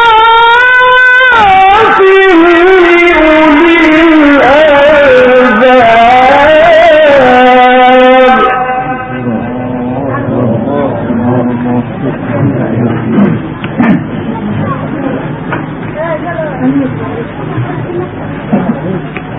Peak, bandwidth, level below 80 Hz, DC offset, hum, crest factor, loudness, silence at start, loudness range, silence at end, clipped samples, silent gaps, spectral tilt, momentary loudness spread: 0 dBFS; 8 kHz; -34 dBFS; under 0.1%; none; 6 dB; -6 LUFS; 0 s; 11 LU; 0 s; 2%; none; -7 dB/octave; 13 LU